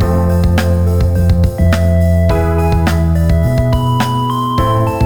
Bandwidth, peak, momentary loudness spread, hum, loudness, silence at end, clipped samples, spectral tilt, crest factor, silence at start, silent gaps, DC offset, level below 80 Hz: 18.5 kHz; -2 dBFS; 2 LU; none; -13 LUFS; 0 s; under 0.1%; -7.5 dB/octave; 10 dB; 0 s; none; 4%; -20 dBFS